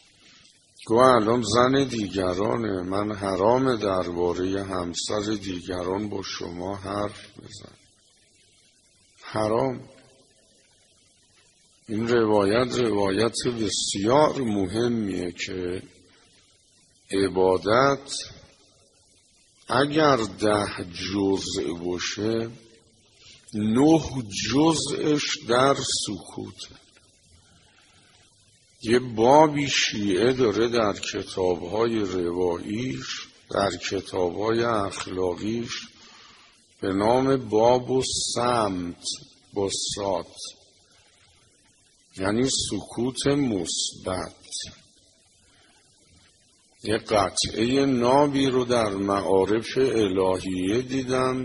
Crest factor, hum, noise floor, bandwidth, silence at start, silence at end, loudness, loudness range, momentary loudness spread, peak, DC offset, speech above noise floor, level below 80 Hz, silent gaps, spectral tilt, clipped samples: 24 dB; none; -60 dBFS; 11.5 kHz; 0.8 s; 0 s; -24 LUFS; 10 LU; 13 LU; -2 dBFS; under 0.1%; 37 dB; -54 dBFS; none; -4.5 dB/octave; under 0.1%